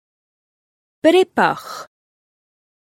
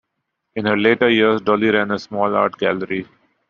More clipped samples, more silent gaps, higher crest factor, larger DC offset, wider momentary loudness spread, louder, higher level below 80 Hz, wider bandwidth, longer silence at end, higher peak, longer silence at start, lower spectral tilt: neither; neither; first, 22 dB vs 16 dB; neither; first, 19 LU vs 10 LU; about the same, -16 LUFS vs -18 LUFS; second, -70 dBFS vs -60 dBFS; first, 16 kHz vs 7 kHz; first, 1.05 s vs 0.45 s; about the same, 0 dBFS vs -2 dBFS; first, 1.05 s vs 0.55 s; first, -4.5 dB/octave vs -3 dB/octave